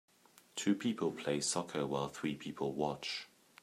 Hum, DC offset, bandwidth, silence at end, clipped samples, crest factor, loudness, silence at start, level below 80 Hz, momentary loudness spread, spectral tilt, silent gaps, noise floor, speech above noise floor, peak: none; under 0.1%; 15 kHz; 0.35 s; under 0.1%; 18 dB; -38 LUFS; 0.55 s; -72 dBFS; 7 LU; -4 dB/octave; none; -58 dBFS; 21 dB; -20 dBFS